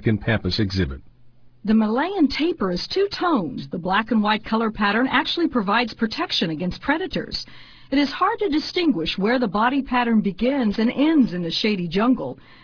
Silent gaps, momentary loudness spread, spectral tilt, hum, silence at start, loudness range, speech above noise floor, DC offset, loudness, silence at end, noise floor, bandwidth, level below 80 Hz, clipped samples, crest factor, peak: none; 6 LU; -6.5 dB/octave; none; 0 s; 2 LU; 26 dB; under 0.1%; -21 LUFS; 0.3 s; -47 dBFS; 5.4 kHz; -44 dBFS; under 0.1%; 16 dB; -6 dBFS